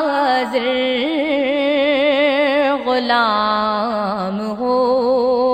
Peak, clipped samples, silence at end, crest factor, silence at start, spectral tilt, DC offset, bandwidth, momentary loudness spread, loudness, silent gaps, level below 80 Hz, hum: -2 dBFS; under 0.1%; 0 s; 14 dB; 0 s; -5.5 dB/octave; under 0.1%; 14 kHz; 5 LU; -17 LUFS; none; -54 dBFS; none